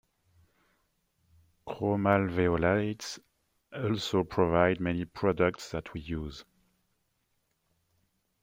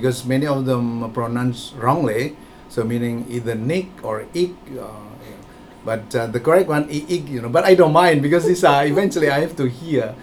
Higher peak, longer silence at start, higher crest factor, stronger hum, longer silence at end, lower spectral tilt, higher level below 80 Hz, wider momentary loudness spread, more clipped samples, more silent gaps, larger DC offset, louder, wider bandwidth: second, -10 dBFS vs 0 dBFS; first, 1.65 s vs 0 s; about the same, 22 dB vs 18 dB; neither; first, 2 s vs 0 s; about the same, -6.5 dB/octave vs -6 dB/octave; second, -56 dBFS vs -50 dBFS; first, 17 LU vs 14 LU; neither; neither; neither; second, -29 LUFS vs -19 LUFS; about the same, 16.5 kHz vs 18 kHz